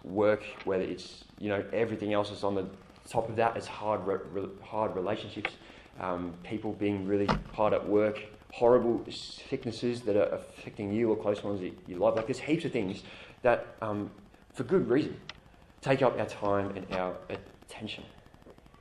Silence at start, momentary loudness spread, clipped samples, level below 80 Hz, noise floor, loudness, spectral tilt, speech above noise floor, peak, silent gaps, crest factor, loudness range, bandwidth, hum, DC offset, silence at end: 0.05 s; 15 LU; under 0.1%; -56 dBFS; -56 dBFS; -31 LUFS; -6.5 dB/octave; 25 dB; -10 dBFS; none; 22 dB; 4 LU; 12 kHz; none; under 0.1%; 0.3 s